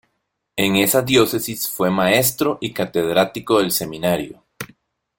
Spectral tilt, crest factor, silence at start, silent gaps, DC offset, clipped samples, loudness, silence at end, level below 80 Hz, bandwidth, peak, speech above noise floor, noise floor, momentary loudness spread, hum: -4 dB/octave; 20 dB; 0.55 s; none; under 0.1%; under 0.1%; -18 LUFS; 0.55 s; -54 dBFS; 17 kHz; 0 dBFS; 55 dB; -73 dBFS; 17 LU; none